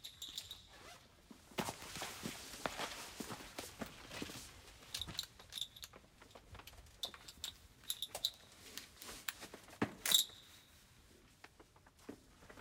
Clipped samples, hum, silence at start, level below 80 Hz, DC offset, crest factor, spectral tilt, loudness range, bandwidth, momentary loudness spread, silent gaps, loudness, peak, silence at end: under 0.1%; none; 0 s; -68 dBFS; under 0.1%; 34 dB; -1.5 dB/octave; 8 LU; 17.5 kHz; 20 LU; none; -43 LUFS; -14 dBFS; 0 s